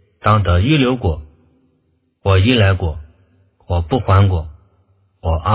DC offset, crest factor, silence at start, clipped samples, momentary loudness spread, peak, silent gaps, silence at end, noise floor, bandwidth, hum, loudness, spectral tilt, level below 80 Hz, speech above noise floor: under 0.1%; 16 dB; 0.25 s; under 0.1%; 12 LU; 0 dBFS; none; 0 s; -62 dBFS; 4 kHz; none; -16 LUFS; -11 dB/octave; -26 dBFS; 49 dB